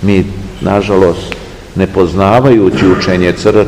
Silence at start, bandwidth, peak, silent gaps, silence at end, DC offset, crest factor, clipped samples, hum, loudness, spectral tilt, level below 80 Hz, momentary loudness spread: 0 s; 12 kHz; 0 dBFS; none; 0 s; 0.6%; 10 dB; 3%; none; -10 LUFS; -7 dB/octave; -30 dBFS; 13 LU